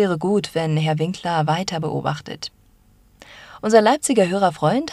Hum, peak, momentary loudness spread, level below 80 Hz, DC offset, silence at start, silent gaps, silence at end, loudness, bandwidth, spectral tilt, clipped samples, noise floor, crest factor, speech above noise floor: none; 0 dBFS; 14 LU; -56 dBFS; under 0.1%; 0 s; none; 0 s; -20 LUFS; 14 kHz; -5.5 dB/octave; under 0.1%; -54 dBFS; 20 dB; 35 dB